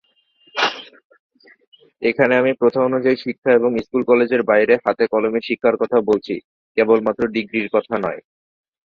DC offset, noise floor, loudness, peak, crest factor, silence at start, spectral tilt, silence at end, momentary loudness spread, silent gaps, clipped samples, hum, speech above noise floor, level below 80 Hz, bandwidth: under 0.1%; -58 dBFS; -18 LUFS; -2 dBFS; 18 dB; 0.55 s; -6 dB/octave; 0.65 s; 8 LU; 1.04-1.10 s, 1.19-1.30 s, 1.67-1.72 s, 3.38-3.42 s, 6.44-6.75 s; under 0.1%; none; 40 dB; -60 dBFS; 6.6 kHz